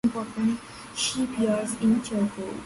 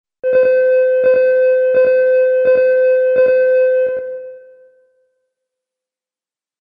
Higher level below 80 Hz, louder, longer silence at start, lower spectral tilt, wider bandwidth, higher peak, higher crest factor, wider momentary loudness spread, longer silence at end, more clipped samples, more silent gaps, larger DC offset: first, -56 dBFS vs -62 dBFS; second, -27 LUFS vs -13 LUFS; second, 0.05 s vs 0.25 s; second, -4.5 dB/octave vs -6.5 dB/octave; first, 11.5 kHz vs 4.9 kHz; second, -12 dBFS vs -4 dBFS; about the same, 14 dB vs 10 dB; about the same, 5 LU vs 5 LU; second, 0 s vs 2.25 s; neither; neither; neither